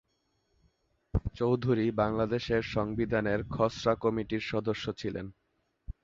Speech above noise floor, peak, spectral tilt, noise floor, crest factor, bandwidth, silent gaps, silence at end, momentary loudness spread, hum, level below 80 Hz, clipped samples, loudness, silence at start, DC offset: 46 dB; -12 dBFS; -7 dB/octave; -76 dBFS; 20 dB; 7.6 kHz; none; 0.15 s; 9 LU; none; -46 dBFS; under 0.1%; -31 LUFS; 1.15 s; under 0.1%